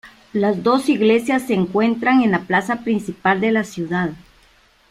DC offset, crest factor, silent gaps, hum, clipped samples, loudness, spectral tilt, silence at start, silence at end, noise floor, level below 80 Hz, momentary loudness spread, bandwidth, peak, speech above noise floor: under 0.1%; 16 dB; none; none; under 0.1%; -18 LUFS; -6 dB/octave; 0.05 s; 0.75 s; -54 dBFS; -56 dBFS; 7 LU; 14 kHz; -4 dBFS; 36 dB